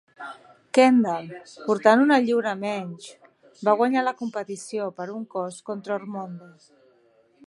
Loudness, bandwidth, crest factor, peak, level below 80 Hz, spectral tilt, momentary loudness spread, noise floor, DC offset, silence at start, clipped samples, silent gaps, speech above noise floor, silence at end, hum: -23 LUFS; 11.5 kHz; 22 dB; -2 dBFS; -78 dBFS; -5.5 dB/octave; 22 LU; -61 dBFS; under 0.1%; 0.2 s; under 0.1%; none; 37 dB; 1 s; none